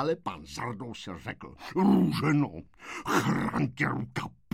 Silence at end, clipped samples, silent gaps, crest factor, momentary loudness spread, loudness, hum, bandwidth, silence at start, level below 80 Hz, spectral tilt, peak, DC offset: 0.25 s; under 0.1%; none; 18 dB; 15 LU; -29 LUFS; none; 16 kHz; 0 s; -56 dBFS; -6.5 dB/octave; -12 dBFS; under 0.1%